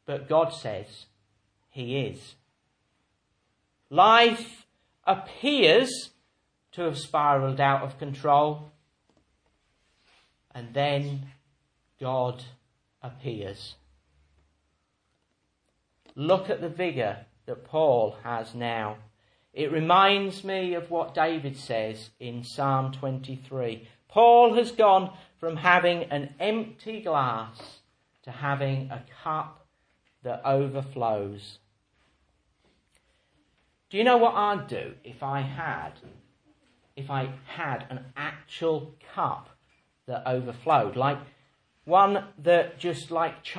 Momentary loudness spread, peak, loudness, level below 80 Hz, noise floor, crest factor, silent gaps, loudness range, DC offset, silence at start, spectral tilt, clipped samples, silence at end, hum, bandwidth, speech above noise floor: 19 LU; -2 dBFS; -26 LUFS; -70 dBFS; -74 dBFS; 24 dB; none; 12 LU; under 0.1%; 0.1 s; -5.5 dB/octave; under 0.1%; 0 s; none; 10.5 kHz; 49 dB